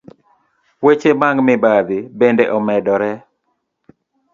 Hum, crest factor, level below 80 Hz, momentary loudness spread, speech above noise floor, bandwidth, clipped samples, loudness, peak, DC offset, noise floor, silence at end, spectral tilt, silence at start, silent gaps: none; 16 dB; -60 dBFS; 7 LU; 55 dB; 7.4 kHz; under 0.1%; -15 LUFS; 0 dBFS; under 0.1%; -69 dBFS; 1.15 s; -7 dB/octave; 0.8 s; none